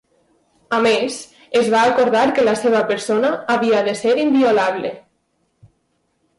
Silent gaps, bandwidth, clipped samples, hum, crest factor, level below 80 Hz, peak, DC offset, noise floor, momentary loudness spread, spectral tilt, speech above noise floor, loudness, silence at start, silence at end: none; 11.5 kHz; under 0.1%; none; 12 dB; -62 dBFS; -6 dBFS; under 0.1%; -67 dBFS; 7 LU; -4 dB/octave; 51 dB; -17 LUFS; 0.7 s; 1.4 s